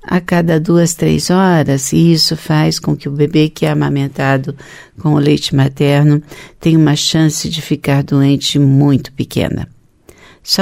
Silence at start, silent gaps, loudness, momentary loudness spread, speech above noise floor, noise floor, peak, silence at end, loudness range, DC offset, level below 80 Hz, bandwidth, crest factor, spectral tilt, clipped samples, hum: 0.05 s; none; -13 LUFS; 8 LU; 32 dB; -44 dBFS; 0 dBFS; 0 s; 2 LU; under 0.1%; -40 dBFS; 16 kHz; 12 dB; -5.5 dB/octave; under 0.1%; none